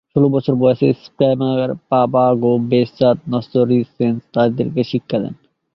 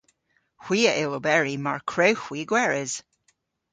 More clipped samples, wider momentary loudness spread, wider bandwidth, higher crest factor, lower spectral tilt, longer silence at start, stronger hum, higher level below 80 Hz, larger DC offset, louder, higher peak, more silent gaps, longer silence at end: neither; about the same, 6 LU vs 7 LU; second, 6 kHz vs 9.6 kHz; second, 14 dB vs 22 dB; first, -10 dB/octave vs -3.5 dB/octave; second, 0.15 s vs 0.6 s; neither; first, -54 dBFS vs -68 dBFS; neither; first, -17 LUFS vs -24 LUFS; about the same, -2 dBFS vs -4 dBFS; neither; second, 0.4 s vs 0.7 s